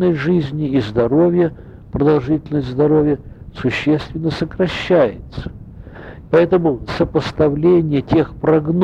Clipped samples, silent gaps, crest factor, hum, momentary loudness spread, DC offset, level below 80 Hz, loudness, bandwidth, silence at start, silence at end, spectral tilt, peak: under 0.1%; none; 14 dB; none; 16 LU; under 0.1%; -38 dBFS; -17 LUFS; 8.2 kHz; 0 s; 0 s; -8.5 dB/octave; -2 dBFS